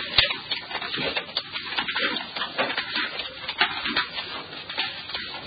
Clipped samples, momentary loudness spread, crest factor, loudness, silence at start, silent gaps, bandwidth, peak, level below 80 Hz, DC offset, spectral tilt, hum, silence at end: under 0.1%; 8 LU; 28 dB; -26 LUFS; 0 s; none; 5.2 kHz; 0 dBFS; -54 dBFS; under 0.1%; -7 dB/octave; none; 0 s